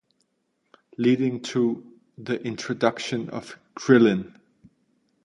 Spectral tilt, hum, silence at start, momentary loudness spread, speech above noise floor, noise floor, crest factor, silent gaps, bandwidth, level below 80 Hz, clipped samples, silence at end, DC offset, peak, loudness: -6 dB/octave; none; 1 s; 21 LU; 50 dB; -73 dBFS; 22 dB; none; 10.5 kHz; -68 dBFS; under 0.1%; 1 s; under 0.1%; -4 dBFS; -24 LUFS